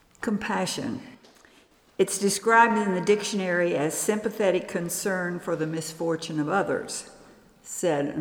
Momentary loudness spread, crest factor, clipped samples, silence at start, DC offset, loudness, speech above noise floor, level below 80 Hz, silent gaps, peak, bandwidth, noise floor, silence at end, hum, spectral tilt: 11 LU; 20 dB; under 0.1%; 0.2 s; under 0.1%; -26 LUFS; 33 dB; -66 dBFS; none; -6 dBFS; 20 kHz; -58 dBFS; 0 s; none; -4 dB/octave